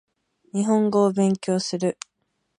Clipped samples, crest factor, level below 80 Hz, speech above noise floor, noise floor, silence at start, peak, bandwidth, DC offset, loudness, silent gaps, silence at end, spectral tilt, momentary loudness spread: under 0.1%; 16 dB; -70 dBFS; 53 dB; -74 dBFS; 0.55 s; -8 dBFS; 11 kHz; under 0.1%; -22 LUFS; none; 0.65 s; -6 dB/octave; 13 LU